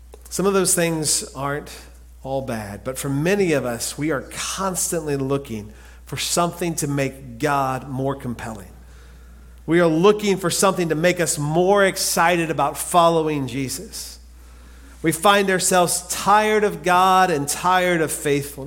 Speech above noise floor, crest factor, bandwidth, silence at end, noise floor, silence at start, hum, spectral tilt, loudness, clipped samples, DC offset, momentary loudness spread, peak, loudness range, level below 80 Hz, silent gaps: 23 dB; 18 dB; 17 kHz; 0 s; -43 dBFS; 0 s; none; -4 dB/octave; -20 LUFS; under 0.1%; under 0.1%; 13 LU; -2 dBFS; 6 LU; -46 dBFS; none